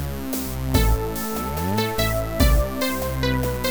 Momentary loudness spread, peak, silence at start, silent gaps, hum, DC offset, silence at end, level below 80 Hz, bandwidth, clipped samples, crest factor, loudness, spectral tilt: 6 LU; -4 dBFS; 0 s; none; none; 1%; 0 s; -26 dBFS; over 20 kHz; under 0.1%; 18 dB; -23 LUFS; -5 dB/octave